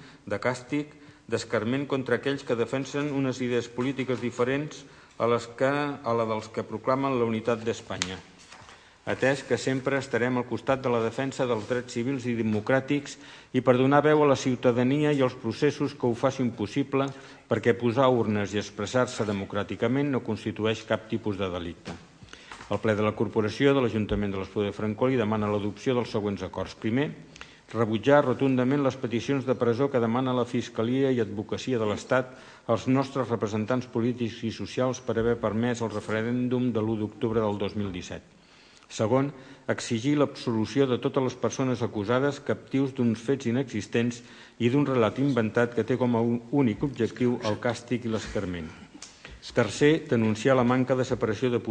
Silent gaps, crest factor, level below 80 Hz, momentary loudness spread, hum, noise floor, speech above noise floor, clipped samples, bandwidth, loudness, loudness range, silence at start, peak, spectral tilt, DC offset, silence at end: none; 24 dB; -58 dBFS; 9 LU; none; -55 dBFS; 28 dB; under 0.1%; 9.8 kHz; -27 LUFS; 4 LU; 0 s; -4 dBFS; -6.5 dB/octave; under 0.1%; 0 s